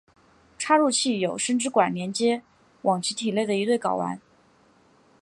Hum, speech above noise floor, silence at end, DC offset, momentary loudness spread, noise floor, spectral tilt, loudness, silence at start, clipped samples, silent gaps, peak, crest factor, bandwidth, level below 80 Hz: none; 36 dB; 1.05 s; under 0.1%; 9 LU; -59 dBFS; -3.5 dB/octave; -24 LUFS; 0.6 s; under 0.1%; none; -6 dBFS; 20 dB; 11.5 kHz; -72 dBFS